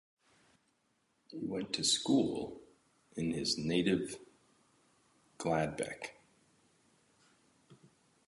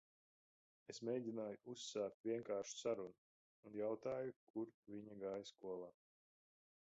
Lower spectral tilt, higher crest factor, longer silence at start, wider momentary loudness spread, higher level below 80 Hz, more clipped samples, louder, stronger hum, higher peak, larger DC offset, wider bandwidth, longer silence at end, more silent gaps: about the same, -4 dB/octave vs -5 dB/octave; about the same, 20 dB vs 18 dB; first, 1.3 s vs 0.9 s; first, 17 LU vs 11 LU; first, -68 dBFS vs -88 dBFS; neither; first, -35 LUFS vs -48 LUFS; neither; first, -18 dBFS vs -30 dBFS; neither; first, 11.5 kHz vs 8 kHz; second, 0.55 s vs 1 s; second, none vs 2.14-2.24 s, 3.18-3.63 s, 4.36-4.54 s, 4.74-4.83 s